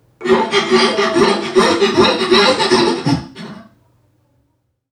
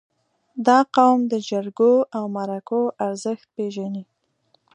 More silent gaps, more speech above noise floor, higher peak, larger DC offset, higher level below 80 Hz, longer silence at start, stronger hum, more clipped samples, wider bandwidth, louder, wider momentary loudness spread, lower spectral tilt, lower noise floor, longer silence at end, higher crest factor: neither; first, 52 dB vs 45 dB; about the same, 0 dBFS vs -2 dBFS; neither; first, -48 dBFS vs -78 dBFS; second, 0.2 s vs 0.55 s; neither; neither; first, 11.5 kHz vs 10 kHz; first, -13 LUFS vs -21 LUFS; second, 9 LU vs 13 LU; second, -4 dB/octave vs -5.5 dB/octave; about the same, -65 dBFS vs -66 dBFS; first, 1.3 s vs 0.7 s; about the same, 16 dB vs 20 dB